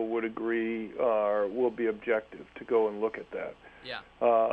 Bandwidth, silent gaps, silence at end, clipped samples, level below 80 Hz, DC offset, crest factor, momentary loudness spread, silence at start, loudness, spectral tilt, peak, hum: 5.2 kHz; none; 0 s; under 0.1%; -66 dBFS; under 0.1%; 16 dB; 14 LU; 0 s; -30 LUFS; -7.5 dB/octave; -14 dBFS; none